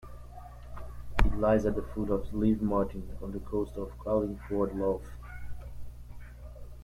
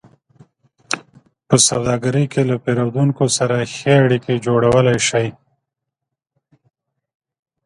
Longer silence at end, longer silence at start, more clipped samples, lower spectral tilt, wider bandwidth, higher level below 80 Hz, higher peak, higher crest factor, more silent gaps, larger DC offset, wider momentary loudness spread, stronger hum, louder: second, 0 s vs 2.35 s; second, 0 s vs 0.9 s; neither; first, -8.5 dB/octave vs -4.5 dB/octave; first, 15 kHz vs 11.5 kHz; first, -40 dBFS vs -52 dBFS; second, -10 dBFS vs 0 dBFS; about the same, 22 dB vs 18 dB; neither; neither; first, 21 LU vs 10 LU; first, 60 Hz at -45 dBFS vs none; second, -31 LUFS vs -16 LUFS